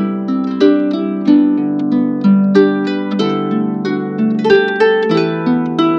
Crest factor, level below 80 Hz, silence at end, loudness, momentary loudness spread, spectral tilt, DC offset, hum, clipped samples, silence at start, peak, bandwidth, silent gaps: 12 dB; -60 dBFS; 0 s; -14 LUFS; 6 LU; -8 dB/octave; under 0.1%; none; under 0.1%; 0 s; 0 dBFS; 7 kHz; none